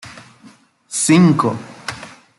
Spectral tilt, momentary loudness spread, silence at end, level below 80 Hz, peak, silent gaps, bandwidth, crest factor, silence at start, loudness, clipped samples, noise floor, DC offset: -5 dB/octave; 21 LU; 0.3 s; -58 dBFS; -2 dBFS; none; 12 kHz; 16 dB; 0.05 s; -15 LUFS; under 0.1%; -47 dBFS; under 0.1%